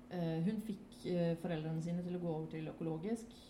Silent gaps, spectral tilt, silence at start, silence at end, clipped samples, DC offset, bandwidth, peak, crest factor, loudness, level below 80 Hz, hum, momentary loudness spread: none; -8 dB/octave; 0 s; 0 s; under 0.1%; under 0.1%; 12.5 kHz; -26 dBFS; 14 dB; -41 LUFS; -68 dBFS; none; 6 LU